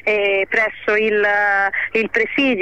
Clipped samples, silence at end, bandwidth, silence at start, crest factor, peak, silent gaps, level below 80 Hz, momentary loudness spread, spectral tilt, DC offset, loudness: under 0.1%; 0 s; 8.4 kHz; 0.05 s; 12 dB; -6 dBFS; none; -56 dBFS; 3 LU; -4.5 dB/octave; 0.4%; -17 LUFS